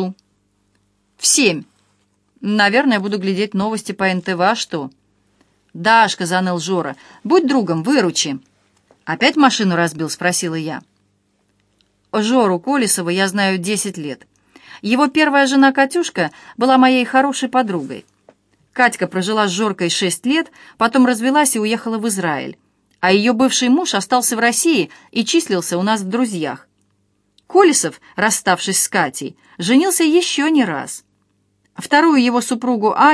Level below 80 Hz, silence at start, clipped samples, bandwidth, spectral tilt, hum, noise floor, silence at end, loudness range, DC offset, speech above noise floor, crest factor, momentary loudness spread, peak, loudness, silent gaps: -66 dBFS; 0 s; under 0.1%; 11 kHz; -3.5 dB/octave; none; -64 dBFS; 0 s; 3 LU; under 0.1%; 48 dB; 18 dB; 13 LU; 0 dBFS; -16 LUFS; none